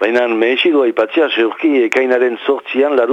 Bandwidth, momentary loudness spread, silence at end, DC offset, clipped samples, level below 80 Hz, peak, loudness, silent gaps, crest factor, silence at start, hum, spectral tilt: 8.2 kHz; 3 LU; 0 s; under 0.1%; under 0.1%; -66 dBFS; -2 dBFS; -14 LUFS; none; 12 dB; 0 s; none; -4 dB/octave